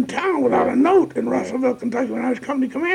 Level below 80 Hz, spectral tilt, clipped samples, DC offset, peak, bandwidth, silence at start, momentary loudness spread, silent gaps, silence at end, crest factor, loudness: -62 dBFS; -6 dB/octave; under 0.1%; under 0.1%; -6 dBFS; 10.5 kHz; 0 s; 7 LU; none; 0 s; 14 dB; -20 LUFS